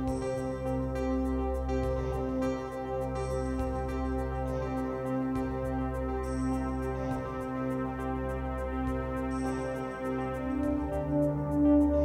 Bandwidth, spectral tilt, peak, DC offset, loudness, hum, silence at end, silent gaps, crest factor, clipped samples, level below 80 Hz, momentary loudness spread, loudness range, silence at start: 15 kHz; -8 dB/octave; -16 dBFS; under 0.1%; -32 LUFS; none; 0 s; none; 16 dB; under 0.1%; -40 dBFS; 5 LU; 1 LU; 0 s